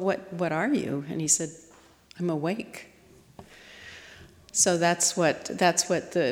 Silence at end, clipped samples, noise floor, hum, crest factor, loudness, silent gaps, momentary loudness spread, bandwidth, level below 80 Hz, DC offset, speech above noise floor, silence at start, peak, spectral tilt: 0 s; under 0.1%; -55 dBFS; none; 20 dB; -26 LUFS; none; 22 LU; 18 kHz; -66 dBFS; under 0.1%; 28 dB; 0 s; -8 dBFS; -3 dB/octave